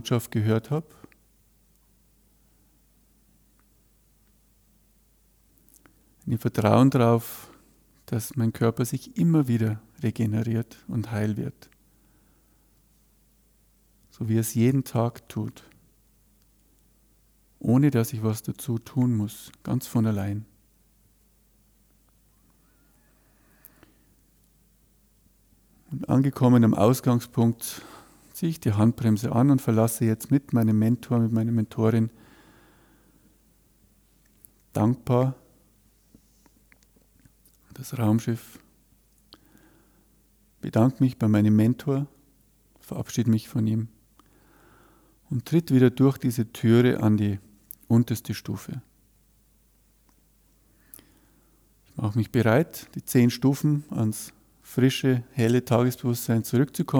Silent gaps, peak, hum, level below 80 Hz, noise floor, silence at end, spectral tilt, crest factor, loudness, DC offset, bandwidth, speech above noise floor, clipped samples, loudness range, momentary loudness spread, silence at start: none; -6 dBFS; none; -62 dBFS; -62 dBFS; 0 s; -7 dB/octave; 20 dB; -24 LUFS; under 0.1%; 19.5 kHz; 39 dB; under 0.1%; 9 LU; 15 LU; 0.05 s